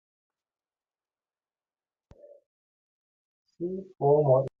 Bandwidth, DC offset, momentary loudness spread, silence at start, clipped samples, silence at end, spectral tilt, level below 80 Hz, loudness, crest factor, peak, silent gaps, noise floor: 2.8 kHz; under 0.1%; 14 LU; 3.6 s; under 0.1%; 0.1 s; -12.5 dB/octave; -70 dBFS; -26 LUFS; 22 dB; -10 dBFS; none; under -90 dBFS